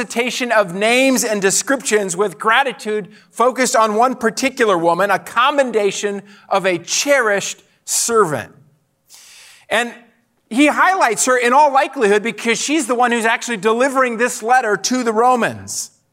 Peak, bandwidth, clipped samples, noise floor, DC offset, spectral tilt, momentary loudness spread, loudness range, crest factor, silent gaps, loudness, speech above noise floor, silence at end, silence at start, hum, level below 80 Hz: -2 dBFS; 16 kHz; under 0.1%; -55 dBFS; under 0.1%; -2.5 dB/octave; 10 LU; 4 LU; 14 dB; none; -16 LUFS; 39 dB; 0.25 s; 0 s; none; -72 dBFS